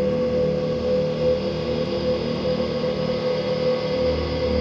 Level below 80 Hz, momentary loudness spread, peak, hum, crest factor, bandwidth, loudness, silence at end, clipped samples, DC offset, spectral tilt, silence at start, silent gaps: -38 dBFS; 2 LU; -10 dBFS; none; 12 dB; 7.2 kHz; -23 LUFS; 0 s; under 0.1%; under 0.1%; -7 dB/octave; 0 s; none